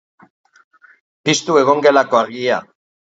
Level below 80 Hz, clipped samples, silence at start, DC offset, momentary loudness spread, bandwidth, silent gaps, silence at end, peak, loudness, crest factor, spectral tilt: -66 dBFS; under 0.1%; 1.25 s; under 0.1%; 9 LU; 8 kHz; none; 0.5 s; 0 dBFS; -15 LUFS; 18 dB; -3.5 dB/octave